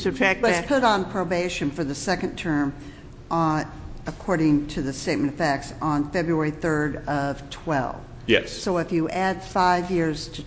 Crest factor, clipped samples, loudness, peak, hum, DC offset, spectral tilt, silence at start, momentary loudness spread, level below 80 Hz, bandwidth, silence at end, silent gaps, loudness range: 22 dB; under 0.1%; -24 LUFS; -2 dBFS; none; under 0.1%; -5.5 dB/octave; 0 s; 9 LU; -44 dBFS; 8 kHz; 0 s; none; 2 LU